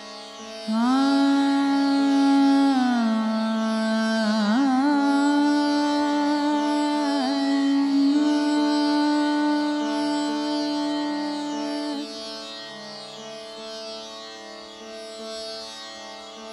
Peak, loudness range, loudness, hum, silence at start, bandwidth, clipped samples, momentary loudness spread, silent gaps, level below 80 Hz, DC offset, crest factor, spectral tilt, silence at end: -10 dBFS; 15 LU; -22 LUFS; none; 0 s; 11.5 kHz; under 0.1%; 17 LU; none; -70 dBFS; under 0.1%; 12 dB; -4.5 dB/octave; 0 s